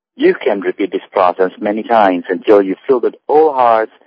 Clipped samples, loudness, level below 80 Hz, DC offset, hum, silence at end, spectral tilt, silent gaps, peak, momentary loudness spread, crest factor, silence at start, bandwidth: 0.2%; -13 LUFS; -64 dBFS; under 0.1%; none; 0.2 s; -8 dB/octave; none; 0 dBFS; 6 LU; 14 dB; 0.2 s; 5.2 kHz